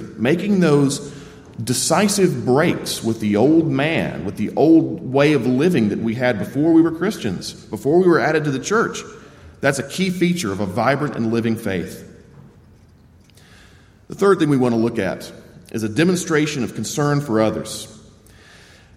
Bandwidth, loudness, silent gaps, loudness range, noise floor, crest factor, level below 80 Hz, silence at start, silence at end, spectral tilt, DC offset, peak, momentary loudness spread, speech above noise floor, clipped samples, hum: 15.5 kHz; -18 LUFS; none; 6 LU; -49 dBFS; 16 dB; -52 dBFS; 0 s; 1 s; -5.5 dB/octave; under 0.1%; -2 dBFS; 14 LU; 31 dB; under 0.1%; none